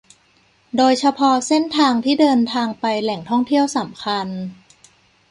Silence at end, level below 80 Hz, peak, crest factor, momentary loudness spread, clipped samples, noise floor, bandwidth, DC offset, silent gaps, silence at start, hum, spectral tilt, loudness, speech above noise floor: 0.75 s; -64 dBFS; -4 dBFS; 16 dB; 9 LU; under 0.1%; -57 dBFS; 11.5 kHz; under 0.1%; none; 0.75 s; none; -4 dB/octave; -18 LUFS; 40 dB